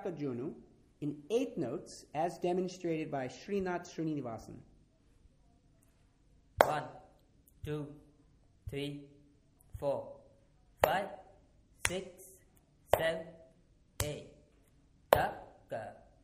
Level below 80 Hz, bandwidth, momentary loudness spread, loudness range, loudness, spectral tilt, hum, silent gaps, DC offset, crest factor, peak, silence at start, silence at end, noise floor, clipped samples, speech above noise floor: -60 dBFS; 15.5 kHz; 23 LU; 6 LU; -36 LUFS; -5 dB/octave; none; none; under 0.1%; 34 dB; -4 dBFS; 0 s; 0.25 s; -67 dBFS; under 0.1%; 30 dB